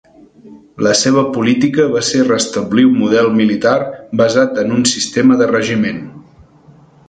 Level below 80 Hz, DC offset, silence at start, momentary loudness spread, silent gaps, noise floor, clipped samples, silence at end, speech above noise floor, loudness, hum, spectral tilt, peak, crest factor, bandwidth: -52 dBFS; under 0.1%; 0.45 s; 6 LU; none; -44 dBFS; under 0.1%; 0.9 s; 32 dB; -13 LUFS; none; -4.5 dB/octave; 0 dBFS; 14 dB; 9.4 kHz